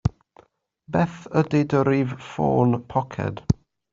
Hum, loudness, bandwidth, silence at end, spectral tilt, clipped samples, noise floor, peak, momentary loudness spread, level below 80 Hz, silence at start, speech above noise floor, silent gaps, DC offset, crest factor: none; -23 LUFS; 7.6 kHz; 0.4 s; -8.5 dB/octave; under 0.1%; -57 dBFS; -4 dBFS; 8 LU; -46 dBFS; 0.05 s; 35 dB; none; under 0.1%; 20 dB